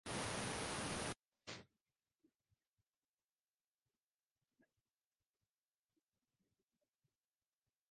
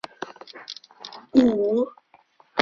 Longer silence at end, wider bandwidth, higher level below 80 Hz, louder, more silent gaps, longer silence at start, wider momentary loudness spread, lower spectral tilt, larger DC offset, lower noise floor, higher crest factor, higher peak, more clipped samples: first, 6.25 s vs 0 s; first, 11.5 kHz vs 7.2 kHz; second, -70 dBFS vs -60 dBFS; second, -45 LUFS vs -22 LUFS; first, 1.28-1.32 s vs none; second, 0.05 s vs 0.2 s; second, 12 LU vs 21 LU; second, -3 dB/octave vs -5.5 dB/octave; neither; first, under -90 dBFS vs -58 dBFS; about the same, 22 dB vs 24 dB; second, -32 dBFS vs -2 dBFS; neither